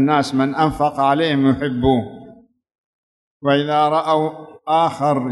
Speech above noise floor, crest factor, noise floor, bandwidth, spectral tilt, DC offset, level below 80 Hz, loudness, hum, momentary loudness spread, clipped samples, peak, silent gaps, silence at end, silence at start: 27 dB; 14 dB; -44 dBFS; 12 kHz; -6.5 dB/octave; under 0.1%; -44 dBFS; -18 LUFS; none; 6 LU; under 0.1%; -4 dBFS; 2.78-3.40 s; 0 s; 0 s